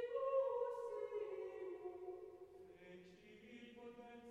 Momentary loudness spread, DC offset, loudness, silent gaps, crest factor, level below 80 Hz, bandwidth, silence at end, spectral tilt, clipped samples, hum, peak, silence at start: 20 LU; under 0.1%; -46 LUFS; none; 18 dB; -84 dBFS; 9.6 kHz; 0 s; -6 dB/octave; under 0.1%; none; -30 dBFS; 0 s